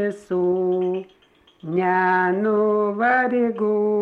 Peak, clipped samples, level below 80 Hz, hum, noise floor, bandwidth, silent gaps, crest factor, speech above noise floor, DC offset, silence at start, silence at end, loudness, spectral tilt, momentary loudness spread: -8 dBFS; under 0.1%; -66 dBFS; none; -57 dBFS; 8 kHz; none; 12 dB; 37 dB; under 0.1%; 0 s; 0 s; -21 LUFS; -8.5 dB/octave; 7 LU